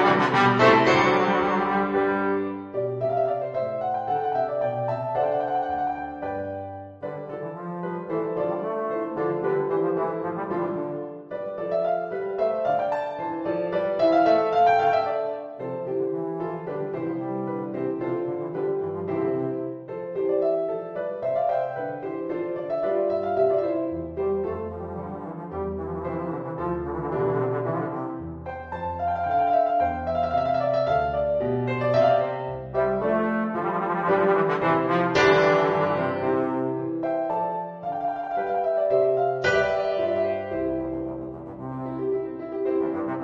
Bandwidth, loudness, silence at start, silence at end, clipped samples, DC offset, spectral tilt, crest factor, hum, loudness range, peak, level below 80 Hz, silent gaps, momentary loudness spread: 7.6 kHz; -25 LUFS; 0 s; 0 s; under 0.1%; under 0.1%; -7 dB/octave; 20 dB; none; 7 LU; -6 dBFS; -54 dBFS; none; 12 LU